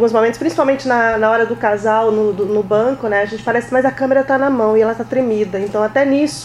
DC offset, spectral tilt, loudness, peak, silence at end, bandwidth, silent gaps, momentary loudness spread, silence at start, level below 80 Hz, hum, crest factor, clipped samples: under 0.1%; -5.5 dB/octave; -15 LUFS; 0 dBFS; 0 s; 12 kHz; none; 4 LU; 0 s; -50 dBFS; none; 14 dB; under 0.1%